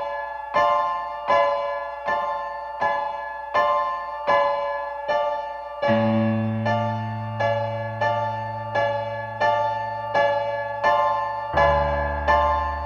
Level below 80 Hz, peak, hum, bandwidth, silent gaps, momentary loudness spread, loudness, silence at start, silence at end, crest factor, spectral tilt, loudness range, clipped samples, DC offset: -42 dBFS; -6 dBFS; none; 7 kHz; none; 8 LU; -23 LUFS; 0 s; 0 s; 16 dB; -7 dB/octave; 2 LU; under 0.1%; under 0.1%